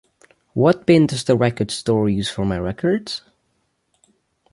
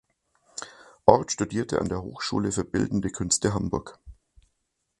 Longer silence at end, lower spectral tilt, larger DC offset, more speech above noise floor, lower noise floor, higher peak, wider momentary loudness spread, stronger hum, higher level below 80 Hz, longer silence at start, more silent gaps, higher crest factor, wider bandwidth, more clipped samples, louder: first, 1.35 s vs 0.85 s; first, -6 dB/octave vs -4.5 dB/octave; neither; about the same, 50 dB vs 52 dB; second, -69 dBFS vs -78 dBFS; about the same, -2 dBFS vs 0 dBFS; second, 9 LU vs 19 LU; neither; about the same, -46 dBFS vs -48 dBFS; about the same, 0.55 s vs 0.55 s; neither; second, 18 dB vs 28 dB; about the same, 11.5 kHz vs 11.5 kHz; neither; first, -19 LUFS vs -26 LUFS